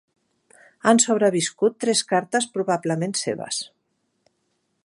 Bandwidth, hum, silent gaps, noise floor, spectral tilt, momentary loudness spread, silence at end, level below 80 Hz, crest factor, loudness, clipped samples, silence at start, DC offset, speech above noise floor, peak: 11.5 kHz; none; none; -72 dBFS; -3.5 dB/octave; 10 LU; 1.2 s; -74 dBFS; 22 dB; -22 LUFS; under 0.1%; 0.85 s; under 0.1%; 51 dB; -2 dBFS